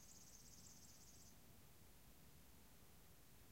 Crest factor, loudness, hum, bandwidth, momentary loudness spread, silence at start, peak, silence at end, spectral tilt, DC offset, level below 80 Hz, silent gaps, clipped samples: 16 dB; -65 LUFS; none; 16 kHz; 5 LU; 0 s; -50 dBFS; 0 s; -3 dB/octave; under 0.1%; -74 dBFS; none; under 0.1%